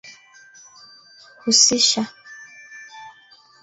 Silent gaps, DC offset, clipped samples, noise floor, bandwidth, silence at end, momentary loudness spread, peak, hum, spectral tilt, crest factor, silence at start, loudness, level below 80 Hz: none; under 0.1%; under 0.1%; -51 dBFS; 8.4 kHz; 0.55 s; 27 LU; -2 dBFS; none; -0.5 dB/octave; 22 dB; 0.05 s; -16 LUFS; -66 dBFS